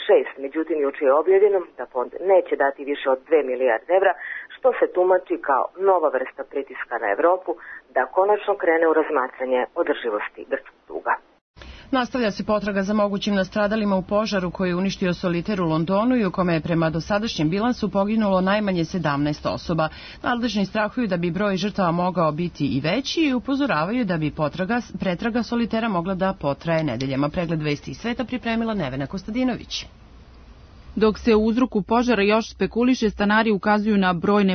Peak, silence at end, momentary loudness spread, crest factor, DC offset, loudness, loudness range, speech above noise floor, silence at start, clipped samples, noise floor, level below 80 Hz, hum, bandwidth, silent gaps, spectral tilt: -6 dBFS; 0 s; 9 LU; 14 dB; under 0.1%; -22 LUFS; 4 LU; 24 dB; 0 s; under 0.1%; -46 dBFS; -48 dBFS; none; 6.6 kHz; 11.41-11.54 s; -6.5 dB/octave